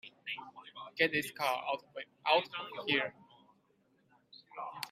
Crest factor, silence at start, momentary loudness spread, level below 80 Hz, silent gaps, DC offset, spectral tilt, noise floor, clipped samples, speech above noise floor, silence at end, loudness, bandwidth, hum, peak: 24 dB; 0.05 s; 17 LU; -84 dBFS; none; under 0.1%; -3.5 dB/octave; -72 dBFS; under 0.1%; 38 dB; 0 s; -34 LUFS; 15 kHz; none; -12 dBFS